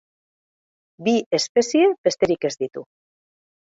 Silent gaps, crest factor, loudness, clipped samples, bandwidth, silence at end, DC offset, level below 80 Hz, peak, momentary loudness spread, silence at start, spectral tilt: 1.26-1.31 s, 1.49-1.55 s, 1.98-2.04 s; 18 dB; -21 LUFS; under 0.1%; 8 kHz; 0.8 s; under 0.1%; -64 dBFS; -6 dBFS; 12 LU; 1 s; -4 dB/octave